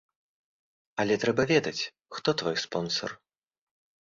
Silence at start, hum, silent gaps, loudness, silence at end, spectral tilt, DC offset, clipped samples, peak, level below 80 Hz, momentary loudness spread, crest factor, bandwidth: 0.95 s; none; none; -28 LUFS; 0.9 s; -4.5 dB/octave; under 0.1%; under 0.1%; -10 dBFS; -66 dBFS; 10 LU; 22 dB; 7.6 kHz